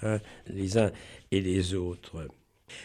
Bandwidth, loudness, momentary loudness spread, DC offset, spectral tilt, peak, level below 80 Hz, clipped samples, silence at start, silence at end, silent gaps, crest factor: 13 kHz; -31 LUFS; 18 LU; under 0.1%; -6 dB/octave; -12 dBFS; -54 dBFS; under 0.1%; 0 s; 0 s; none; 18 dB